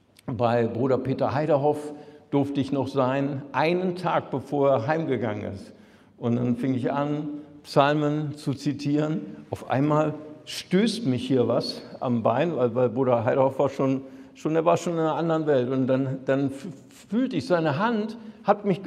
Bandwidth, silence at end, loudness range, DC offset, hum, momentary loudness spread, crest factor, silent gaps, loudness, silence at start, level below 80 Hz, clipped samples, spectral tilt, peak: 13.5 kHz; 0 s; 2 LU; under 0.1%; none; 10 LU; 20 dB; none; -25 LUFS; 0.25 s; -66 dBFS; under 0.1%; -7 dB/octave; -4 dBFS